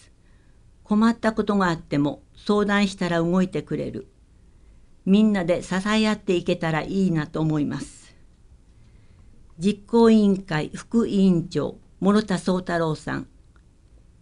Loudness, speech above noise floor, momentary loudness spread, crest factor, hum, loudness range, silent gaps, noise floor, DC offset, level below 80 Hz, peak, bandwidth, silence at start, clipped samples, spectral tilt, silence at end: -23 LUFS; 32 dB; 11 LU; 18 dB; none; 4 LU; none; -53 dBFS; under 0.1%; -48 dBFS; -6 dBFS; 11 kHz; 0.9 s; under 0.1%; -6.5 dB/octave; 1 s